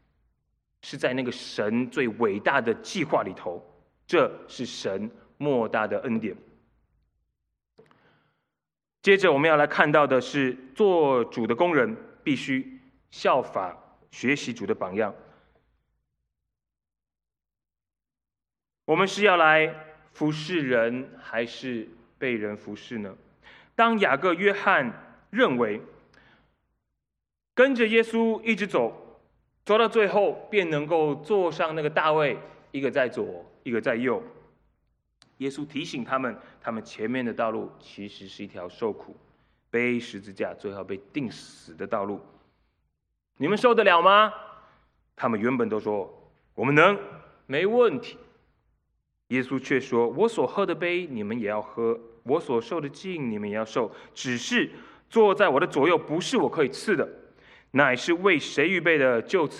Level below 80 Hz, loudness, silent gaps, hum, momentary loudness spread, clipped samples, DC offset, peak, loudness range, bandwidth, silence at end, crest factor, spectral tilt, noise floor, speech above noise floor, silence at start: -70 dBFS; -25 LUFS; none; none; 16 LU; under 0.1%; under 0.1%; 0 dBFS; 9 LU; 11 kHz; 0 s; 26 dB; -5 dB/octave; under -90 dBFS; over 65 dB; 0.85 s